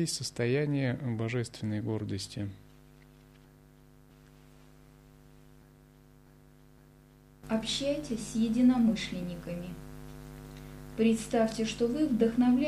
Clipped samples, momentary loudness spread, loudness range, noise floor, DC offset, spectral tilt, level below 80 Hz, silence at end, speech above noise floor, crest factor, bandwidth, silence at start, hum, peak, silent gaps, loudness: under 0.1%; 21 LU; 11 LU; -58 dBFS; under 0.1%; -5.5 dB/octave; -56 dBFS; 0 s; 28 dB; 18 dB; 14 kHz; 0 s; none; -14 dBFS; none; -31 LUFS